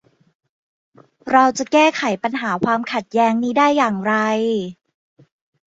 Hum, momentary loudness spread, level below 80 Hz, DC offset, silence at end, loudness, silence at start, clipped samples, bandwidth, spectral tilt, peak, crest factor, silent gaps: none; 7 LU; -64 dBFS; under 0.1%; 0.95 s; -18 LUFS; 1.25 s; under 0.1%; 8 kHz; -4.5 dB/octave; -2 dBFS; 18 dB; none